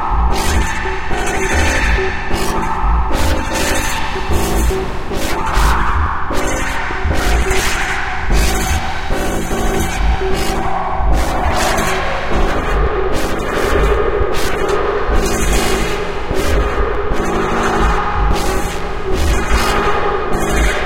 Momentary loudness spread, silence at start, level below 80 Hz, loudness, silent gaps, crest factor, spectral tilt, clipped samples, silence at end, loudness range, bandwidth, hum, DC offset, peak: 4 LU; 0 s; -18 dBFS; -17 LUFS; none; 14 dB; -4.5 dB/octave; under 0.1%; 0 s; 1 LU; 16 kHz; none; 4%; 0 dBFS